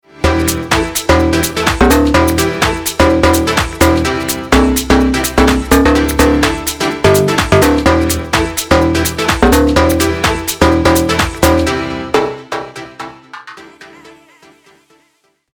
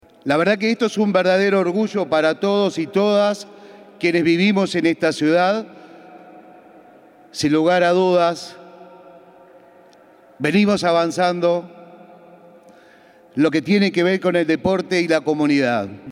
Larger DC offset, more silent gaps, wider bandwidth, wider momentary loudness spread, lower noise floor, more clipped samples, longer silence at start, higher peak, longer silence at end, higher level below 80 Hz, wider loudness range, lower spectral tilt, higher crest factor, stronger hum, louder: neither; neither; first, over 20 kHz vs 12 kHz; about the same, 7 LU vs 7 LU; first, -58 dBFS vs -49 dBFS; neither; about the same, 0.2 s vs 0.25 s; first, 0 dBFS vs -4 dBFS; first, 1.45 s vs 0 s; first, -22 dBFS vs -64 dBFS; first, 7 LU vs 3 LU; about the same, -4.5 dB/octave vs -5.5 dB/octave; about the same, 12 dB vs 16 dB; neither; first, -12 LUFS vs -18 LUFS